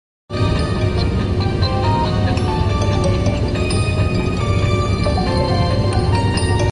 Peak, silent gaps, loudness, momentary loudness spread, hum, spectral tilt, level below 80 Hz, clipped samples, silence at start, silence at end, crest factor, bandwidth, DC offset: -4 dBFS; none; -18 LUFS; 2 LU; none; -6.5 dB/octave; -24 dBFS; under 0.1%; 0.3 s; 0 s; 12 dB; 10.5 kHz; under 0.1%